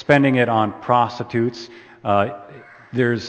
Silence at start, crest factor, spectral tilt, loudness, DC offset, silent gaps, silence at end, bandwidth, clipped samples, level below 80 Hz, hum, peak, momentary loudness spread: 0.1 s; 20 dB; -7 dB/octave; -20 LUFS; under 0.1%; none; 0 s; 8.6 kHz; under 0.1%; -60 dBFS; none; 0 dBFS; 17 LU